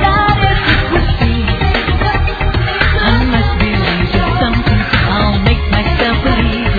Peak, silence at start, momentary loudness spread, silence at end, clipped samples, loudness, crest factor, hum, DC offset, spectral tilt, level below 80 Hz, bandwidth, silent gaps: 0 dBFS; 0 s; 3 LU; 0 s; under 0.1%; -13 LUFS; 12 dB; none; under 0.1%; -8 dB/octave; -16 dBFS; 4.9 kHz; none